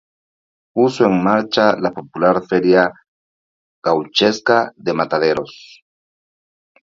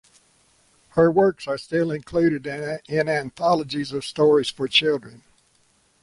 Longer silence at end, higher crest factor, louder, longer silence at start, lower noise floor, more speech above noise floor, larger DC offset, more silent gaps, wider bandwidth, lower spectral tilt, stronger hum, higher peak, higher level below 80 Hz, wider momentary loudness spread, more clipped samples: first, 1.35 s vs 0.85 s; about the same, 18 dB vs 18 dB; first, -16 LUFS vs -22 LUFS; second, 0.75 s vs 0.95 s; first, under -90 dBFS vs -62 dBFS; first, over 74 dB vs 41 dB; neither; first, 3.08-3.82 s vs none; second, 7.8 kHz vs 11.5 kHz; about the same, -5.5 dB/octave vs -5.5 dB/octave; neither; first, 0 dBFS vs -6 dBFS; about the same, -58 dBFS vs -58 dBFS; about the same, 8 LU vs 10 LU; neither